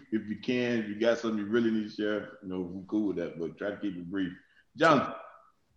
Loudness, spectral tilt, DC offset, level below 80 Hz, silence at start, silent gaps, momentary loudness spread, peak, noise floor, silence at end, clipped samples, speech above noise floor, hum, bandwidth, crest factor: -31 LUFS; -6 dB/octave; under 0.1%; -70 dBFS; 0 s; none; 12 LU; -8 dBFS; -57 dBFS; 0.45 s; under 0.1%; 27 dB; none; 8.4 kHz; 22 dB